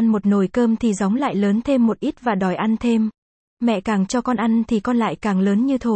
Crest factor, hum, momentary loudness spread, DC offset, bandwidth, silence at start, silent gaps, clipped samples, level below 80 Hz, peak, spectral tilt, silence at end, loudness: 12 dB; none; 3 LU; under 0.1%; 8.8 kHz; 0 s; 3.18-3.57 s; under 0.1%; -50 dBFS; -6 dBFS; -6.5 dB/octave; 0 s; -20 LUFS